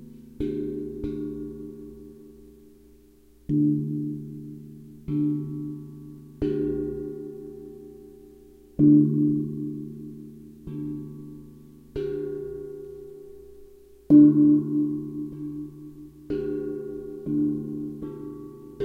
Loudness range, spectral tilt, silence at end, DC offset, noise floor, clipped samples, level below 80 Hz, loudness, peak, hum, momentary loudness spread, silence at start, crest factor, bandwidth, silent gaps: 13 LU; -11 dB/octave; 0 s; under 0.1%; -55 dBFS; under 0.1%; -52 dBFS; -25 LUFS; -6 dBFS; none; 25 LU; 0 s; 22 dB; 3.2 kHz; none